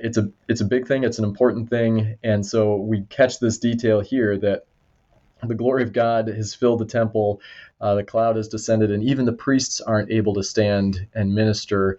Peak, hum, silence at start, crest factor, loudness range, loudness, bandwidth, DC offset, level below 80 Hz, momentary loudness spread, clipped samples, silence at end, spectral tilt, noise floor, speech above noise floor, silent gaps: -4 dBFS; none; 0 s; 16 dB; 2 LU; -21 LUFS; 8.2 kHz; under 0.1%; -54 dBFS; 5 LU; under 0.1%; 0 s; -6 dB/octave; -60 dBFS; 40 dB; none